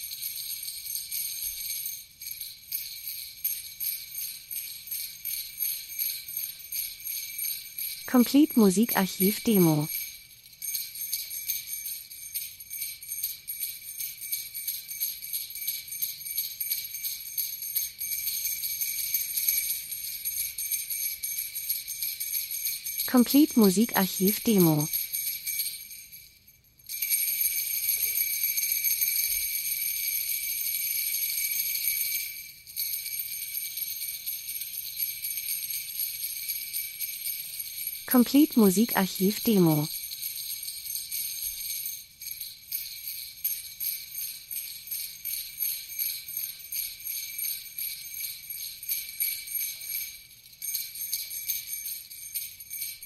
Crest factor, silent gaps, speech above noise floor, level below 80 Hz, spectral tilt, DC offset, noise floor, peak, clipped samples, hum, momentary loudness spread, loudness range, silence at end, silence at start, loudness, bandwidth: 22 dB; none; 35 dB; -66 dBFS; -3 dB/octave; under 0.1%; -58 dBFS; -8 dBFS; under 0.1%; none; 12 LU; 8 LU; 0 s; 0 s; -28 LUFS; 16 kHz